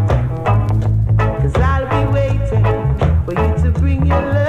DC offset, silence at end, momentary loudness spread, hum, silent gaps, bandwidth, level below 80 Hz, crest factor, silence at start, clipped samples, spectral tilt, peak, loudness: under 0.1%; 0 s; 1 LU; none; none; 7.4 kHz; -20 dBFS; 12 dB; 0 s; under 0.1%; -8.5 dB/octave; -2 dBFS; -16 LUFS